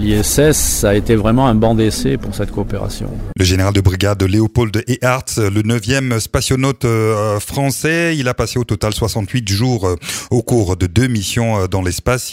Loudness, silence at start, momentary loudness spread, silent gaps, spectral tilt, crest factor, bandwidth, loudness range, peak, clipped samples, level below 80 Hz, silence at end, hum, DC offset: -15 LUFS; 0 s; 6 LU; none; -5 dB/octave; 14 dB; 16.5 kHz; 2 LU; 0 dBFS; under 0.1%; -28 dBFS; 0 s; none; under 0.1%